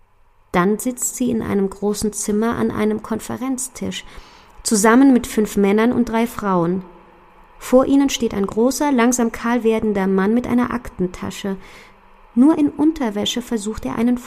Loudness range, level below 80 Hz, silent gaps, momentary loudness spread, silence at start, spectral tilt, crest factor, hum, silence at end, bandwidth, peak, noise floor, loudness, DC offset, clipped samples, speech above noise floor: 4 LU; -44 dBFS; none; 11 LU; 0.55 s; -5 dB/octave; 18 dB; none; 0 s; 15.5 kHz; 0 dBFS; -53 dBFS; -18 LUFS; under 0.1%; under 0.1%; 35 dB